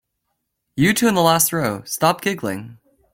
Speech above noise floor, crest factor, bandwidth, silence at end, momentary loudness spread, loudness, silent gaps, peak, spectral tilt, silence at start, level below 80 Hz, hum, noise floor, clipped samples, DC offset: 56 dB; 18 dB; 17 kHz; 0.4 s; 12 LU; -18 LUFS; none; -2 dBFS; -4 dB/octave; 0.75 s; -54 dBFS; none; -75 dBFS; under 0.1%; under 0.1%